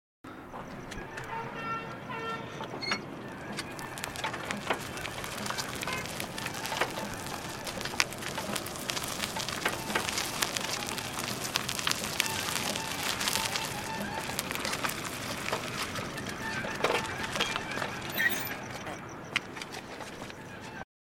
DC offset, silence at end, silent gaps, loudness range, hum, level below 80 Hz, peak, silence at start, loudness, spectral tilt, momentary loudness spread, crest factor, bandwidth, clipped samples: under 0.1%; 0.35 s; none; 5 LU; none; -58 dBFS; 0 dBFS; 0.25 s; -33 LUFS; -2.5 dB/octave; 11 LU; 34 dB; 17 kHz; under 0.1%